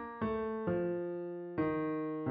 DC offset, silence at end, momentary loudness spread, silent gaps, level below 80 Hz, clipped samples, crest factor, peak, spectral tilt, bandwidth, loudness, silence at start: under 0.1%; 0 s; 6 LU; none; -62 dBFS; under 0.1%; 14 dB; -22 dBFS; -7.5 dB/octave; 4.9 kHz; -37 LUFS; 0 s